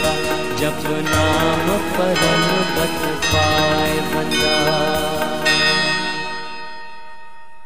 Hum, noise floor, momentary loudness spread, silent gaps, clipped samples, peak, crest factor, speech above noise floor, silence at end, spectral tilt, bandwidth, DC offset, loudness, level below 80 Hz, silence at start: none; -43 dBFS; 10 LU; none; under 0.1%; -2 dBFS; 16 dB; 25 dB; 0.2 s; -3.5 dB/octave; 16 kHz; 3%; -17 LUFS; -40 dBFS; 0 s